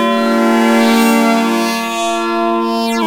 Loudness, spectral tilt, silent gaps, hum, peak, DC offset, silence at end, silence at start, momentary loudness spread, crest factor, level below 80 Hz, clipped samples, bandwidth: -13 LUFS; -4 dB/octave; none; none; 0 dBFS; under 0.1%; 0 s; 0 s; 6 LU; 12 dB; -58 dBFS; under 0.1%; 16.5 kHz